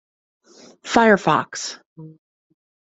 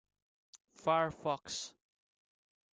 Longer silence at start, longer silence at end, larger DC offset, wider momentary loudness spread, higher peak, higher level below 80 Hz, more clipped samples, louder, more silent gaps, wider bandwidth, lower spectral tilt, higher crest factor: first, 0.85 s vs 0.55 s; second, 0.9 s vs 1.05 s; neither; first, 22 LU vs 10 LU; first, -2 dBFS vs -18 dBFS; first, -60 dBFS vs -72 dBFS; neither; first, -18 LUFS vs -36 LUFS; first, 1.86-1.96 s vs 0.64-0.68 s; second, 8.2 kHz vs 9.6 kHz; about the same, -4.5 dB/octave vs -3.5 dB/octave; about the same, 20 dB vs 22 dB